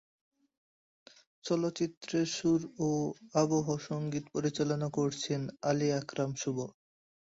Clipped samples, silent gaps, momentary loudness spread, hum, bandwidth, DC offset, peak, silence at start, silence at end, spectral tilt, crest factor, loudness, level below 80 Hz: under 0.1%; 1.97-2.01 s; 6 LU; none; 8 kHz; under 0.1%; -14 dBFS; 1.45 s; 0.65 s; -5.5 dB/octave; 18 dB; -33 LUFS; -70 dBFS